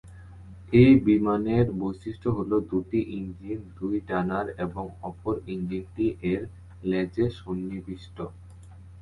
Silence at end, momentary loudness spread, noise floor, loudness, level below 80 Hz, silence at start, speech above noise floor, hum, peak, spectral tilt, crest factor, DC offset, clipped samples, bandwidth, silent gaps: 0 s; 18 LU; -46 dBFS; -26 LUFS; -48 dBFS; 0.05 s; 21 dB; none; -6 dBFS; -9.5 dB/octave; 20 dB; under 0.1%; under 0.1%; 10.5 kHz; none